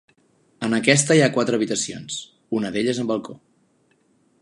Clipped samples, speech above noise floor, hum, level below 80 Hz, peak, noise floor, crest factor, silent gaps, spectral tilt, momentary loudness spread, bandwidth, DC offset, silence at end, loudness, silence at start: under 0.1%; 42 dB; none; -64 dBFS; 0 dBFS; -63 dBFS; 22 dB; none; -4 dB/octave; 15 LU; 11.5 kHz; under 0.1%; 1.05 s; -21 LUFS; 0.6 s